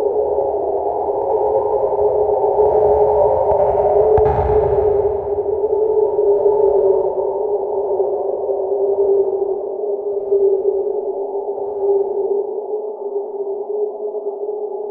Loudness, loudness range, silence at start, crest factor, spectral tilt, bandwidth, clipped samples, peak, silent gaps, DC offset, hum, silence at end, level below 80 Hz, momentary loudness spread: -17 LUFS; 7 LU; 0 s; 14 dB; -11.5 dB/octave; 2.6 kHz; under 0.1%; -2 dBFS; none; under 0.1%; none; 0 s; -38 dBFS; 10 LU